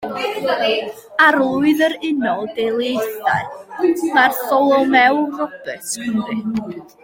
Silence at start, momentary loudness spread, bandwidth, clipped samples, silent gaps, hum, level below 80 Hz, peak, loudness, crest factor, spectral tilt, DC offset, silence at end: 0 s; 12 LU; 17 kHz; under 0.1%; none; none; -60 dBFS; -2 dBFS; -17 LUFS; 16 dB; -4 dB/octave; under 0.1%; 0.2 s